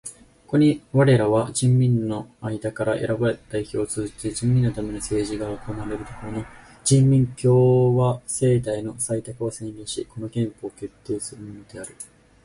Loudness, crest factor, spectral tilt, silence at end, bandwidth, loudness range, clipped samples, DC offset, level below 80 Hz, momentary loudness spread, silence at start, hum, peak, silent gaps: -22 LUFS; 16 dB; -6.5 dB/octave; 0.4 s; 11.5 kHz; 7 LU; under 0.1%; under 0.1%; -48 dBFS; 18 LU; 0.05 s; none; -6 dBFS; none